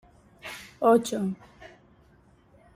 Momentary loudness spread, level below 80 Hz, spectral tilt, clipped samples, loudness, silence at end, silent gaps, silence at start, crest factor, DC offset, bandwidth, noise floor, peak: 20 LU; -64 dBFS; -5.5 dB/octave; under 0.1%; -25 LUFS; 1.1 s; none; 0.45 s; 20 dB; under 0.1%; 16 kHz; -59 dBFS; -10 dBFS